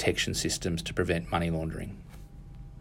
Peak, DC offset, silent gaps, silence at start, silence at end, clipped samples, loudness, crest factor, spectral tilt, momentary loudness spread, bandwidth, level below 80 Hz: -12 dBFS; under 0.1%; none; 0 s; 0 s; under 0.1%; -30 LUFS; 20 dB; -4 dB/octave; 20 LU; 16 kHz; -44 dBFS